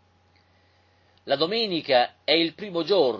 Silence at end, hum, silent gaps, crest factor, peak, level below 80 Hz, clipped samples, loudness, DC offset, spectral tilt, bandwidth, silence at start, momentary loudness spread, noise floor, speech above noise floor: 0 s; none; none; 20 dB; -6 dBFS; -68 dBFS; under 0.1%; -23 LUFS; under 0.1%; -6 dB/octave; 7.4 kHz; 1.25 s; 6 LU; -62 dBFS; 38 dB